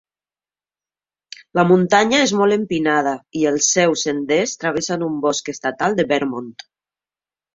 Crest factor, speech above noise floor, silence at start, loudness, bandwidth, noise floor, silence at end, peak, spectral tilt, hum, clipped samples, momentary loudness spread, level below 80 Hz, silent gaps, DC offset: 18 dB; over 72 dB; 1.55 s; -18 LUFS; 7.8 kHz; under -90 dBFS; 1.05 s; -2 dBFS; -3.5 dB/octave; 50 Hz at -50 dBFS; under 0.1%; 9 LU; -60 dBFS; none; under 0.1%